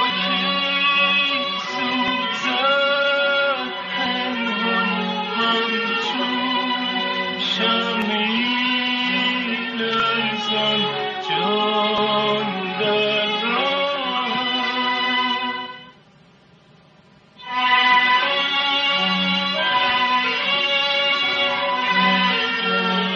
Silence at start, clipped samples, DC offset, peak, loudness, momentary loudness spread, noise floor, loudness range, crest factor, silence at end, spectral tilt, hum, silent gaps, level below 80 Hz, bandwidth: 0 s; under 0.1%; under 0.1%; -4 dBFS; -19 LUFS; 6 LU; -51 dBFS; 3 LU; 16 dB; 0 s; -4 dB/octave; none; none; -66 dBFS; 7.4 kHz